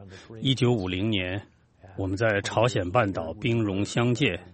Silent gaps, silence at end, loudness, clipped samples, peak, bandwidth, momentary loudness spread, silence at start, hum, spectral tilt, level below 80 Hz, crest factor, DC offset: none; 0.05 s; -26 LUFS; under 0.1%; -6 dBFS; 8.8 kHz; 9 LU; 0 s; none; -6 dB/octave; -56 dBFS; 20 dB; under 0.1%